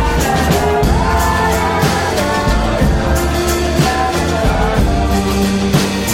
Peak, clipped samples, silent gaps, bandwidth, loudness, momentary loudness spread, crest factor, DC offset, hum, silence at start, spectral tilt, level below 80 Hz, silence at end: 0 dBFS; under 0.1%; none; 16.5 kHz; -14 LUFS; 2 LU; 12 dB; under 0.1%; none; 0 s; -5 dB/octave; -20 dBFS; 0 s